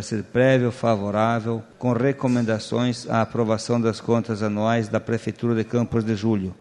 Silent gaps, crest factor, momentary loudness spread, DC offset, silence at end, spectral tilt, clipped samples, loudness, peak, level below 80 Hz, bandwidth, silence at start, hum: none; 16 dB; 5 LU; under 0.1%; 0.05 s; -7 dB/octave; under 0.1%; -23 LUFS; -6 dBFS; -56 dBFS; 11 kHz; 0 s; none